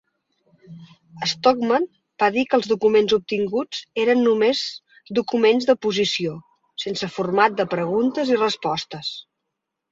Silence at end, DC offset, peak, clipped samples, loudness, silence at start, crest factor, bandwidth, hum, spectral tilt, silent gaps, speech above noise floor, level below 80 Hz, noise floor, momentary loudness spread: 0.7 s; under 0.1%; -2 dBFS; under 0.1%; -21 LUFS; 0.7 s; 18 dB; 7.8 kHz; none; -4.5 dB/octave; none; 60 dB; -64 dBFS; -81 dBFS; 12 LU